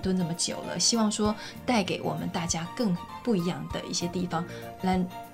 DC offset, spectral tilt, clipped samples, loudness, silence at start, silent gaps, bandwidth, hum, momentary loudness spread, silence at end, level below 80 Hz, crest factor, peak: under 0.1%; -4 dB/octave; under 0.1%; -29 LUFS; 0 s; none; 16 kHz; none; 7 LU; 0 s; -52 dBFS; 20 dB; -10 dBFS